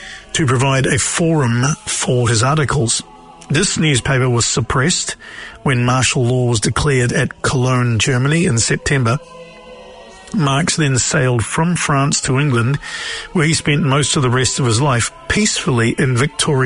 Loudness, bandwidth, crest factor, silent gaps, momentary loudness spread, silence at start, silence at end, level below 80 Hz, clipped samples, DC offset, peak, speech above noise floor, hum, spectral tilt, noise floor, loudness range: -15 LUFS; 11 kHz; 14 dB; none; 5 LU; 0 s; 0 s; -38 dBFS; under 0.1%; under 0.1%; -2 dBFS; 22 dB; none; -4 dB/octave; -37 dBFS; 2 LU